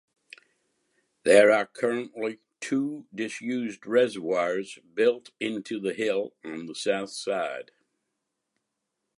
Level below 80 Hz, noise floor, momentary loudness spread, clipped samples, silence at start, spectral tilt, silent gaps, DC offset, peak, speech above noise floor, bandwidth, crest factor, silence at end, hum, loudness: -78 dBFS; -82 dBFS; 14 LU; under 0.1%; 1.25 s; -4 dB/octave; none; under 0.1%; -4 dBFS; 56 dB; 11.5 kHz; 24 dB; 1.55 s; none; -27 LUFS